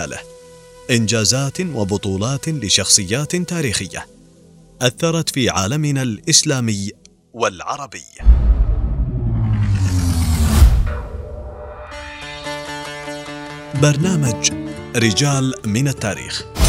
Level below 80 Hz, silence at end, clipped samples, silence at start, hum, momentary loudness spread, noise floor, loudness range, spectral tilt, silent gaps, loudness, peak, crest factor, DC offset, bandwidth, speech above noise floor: -22 dBFS; 0 s; under 0.1%; 0 s; none; 17 LU; -46 dBFS; 4 LU; -4 dB/octave; none; -18 LUFS; 0 dBFS; 18 dB; under 0.1%; 16 kHz; 28 dB